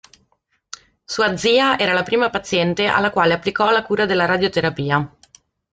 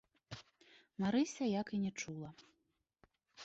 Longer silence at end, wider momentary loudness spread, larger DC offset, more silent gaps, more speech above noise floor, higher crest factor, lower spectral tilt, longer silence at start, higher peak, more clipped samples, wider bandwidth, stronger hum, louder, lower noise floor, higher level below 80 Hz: first, 0.65 s vs 0 s; second, 14 LU vs 19 LU; neither; neither; about the same, 48 dB vs 45 dB; about the same, 16 dB vs 16 dB; about the same, -4.5 dB/octave vs -5.5 dB/octave; first, 1.1 s vs 0.3 s; first, -2 dBFS vs -24 dBFS; neither; first, 9.4 kHz vs 8 kHz; neither; first, -18 LUFS vs -39 LUFS; second, -66 dBFS vs -83 dBFS; first, -54 dBFS vs -74 dBFS